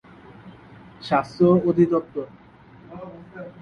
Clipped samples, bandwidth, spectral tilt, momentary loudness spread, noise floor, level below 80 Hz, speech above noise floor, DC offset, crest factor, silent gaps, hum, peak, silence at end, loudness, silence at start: under 0.1%; 6.6 kHz; -8.5 dB/octave; 22 LU; -48 dBFS; -58 dBFS; 28 dB; under 0.1%; 18 dB; none; none; -6 dBFS; 0.1 s; -21 LUFS; 0.45 s